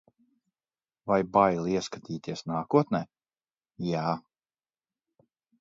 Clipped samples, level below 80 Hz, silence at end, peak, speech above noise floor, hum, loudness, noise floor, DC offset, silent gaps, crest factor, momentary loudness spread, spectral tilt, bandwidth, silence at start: under 0.1%; -64 dBFS; 1.4 s; -6 dBFS; over 63 dB; none; -28 LUFS; under -90 dBFS; under 0.1%; none; 24 dB; 13 LU; -6.5 dB/octave; 7.8 kHz; 1.05 s